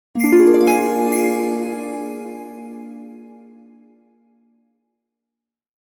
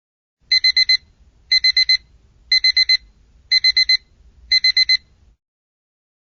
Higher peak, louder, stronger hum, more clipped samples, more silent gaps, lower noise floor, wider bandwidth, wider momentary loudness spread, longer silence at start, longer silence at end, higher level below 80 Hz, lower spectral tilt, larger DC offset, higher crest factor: first, -2 dBFS vs -6 dBFS; second, -17 LUFS vs -14 LUFS; neither; neither; neither; first, -86 dBFS vs -52 dBFS; first, 18.5 kHz vs 6.8 kHz; first, 23 LU vs 5 LU; second, 0.15 s vs 0.5 s; first, 2.65 s vs 1.3 s; second, -64 dBFS vs -52 dBFS; first, -4.5 dB/octave vs 3.5 dB/octave; neither; about the same, 18 dB vs 14 dB